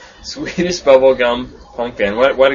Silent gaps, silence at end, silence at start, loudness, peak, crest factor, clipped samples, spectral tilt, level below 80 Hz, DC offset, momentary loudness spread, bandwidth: none; 0 s; 0 s; -14 LUFS; 0 dBFS; 14 dB; under 0.1%; -4.5 dB/octave; -42 dBFS; under 0.1%; 15 LU; 7.4 kHz